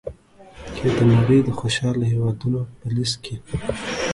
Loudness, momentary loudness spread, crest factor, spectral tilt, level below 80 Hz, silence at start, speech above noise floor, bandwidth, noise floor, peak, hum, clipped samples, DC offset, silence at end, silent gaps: -21 LUFS; 13 LU; 16 dB; -6 dB/octave; -42 dBFS; 0.05 s; 25 dB; 11.5 kHz; -45 dBFS; -4 dBFS; none; under 0.1%; under 0.1%; 0 s; none